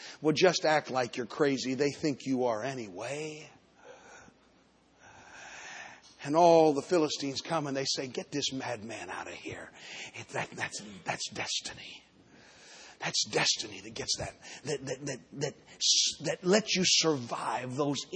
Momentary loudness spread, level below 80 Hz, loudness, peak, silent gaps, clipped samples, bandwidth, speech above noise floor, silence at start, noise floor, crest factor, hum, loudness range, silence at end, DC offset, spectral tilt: 19 LU; -70 dBFS; -30 LUFS; -10 dBFS; none; under 0.1%; 9.6 kHz; 33 dB; 0 s; -64 dBFS; 22 dB; none; 9 LU; 0 s; under 0.1%; -3 dB/octave